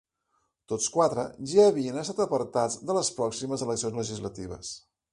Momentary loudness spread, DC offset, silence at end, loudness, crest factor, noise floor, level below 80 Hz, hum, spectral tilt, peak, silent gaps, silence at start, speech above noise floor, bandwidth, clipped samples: 16 LU; under 0.1%; 0.35 s; -27 LUFS; 20 dB; -75 dBFS; -60 dBFS; none; -4.5 dB/octave; -8 dBFS; none; 0.7 s; 48 dB; 11.5 kHz; under 0.1%